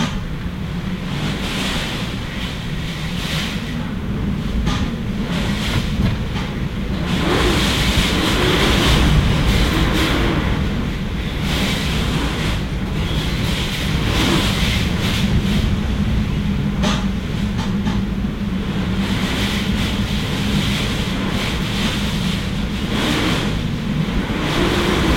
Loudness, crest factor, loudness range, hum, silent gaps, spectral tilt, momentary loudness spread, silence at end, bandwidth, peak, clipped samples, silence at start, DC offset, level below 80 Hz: -19 LUFS; 16 dB; 6 LU; none; none; -5 dB/octave; 7 LU; 0 s; 16.5 kHz; -4 dBFS; under 0.1%; 0 s; under 0.1%; -26 dBFS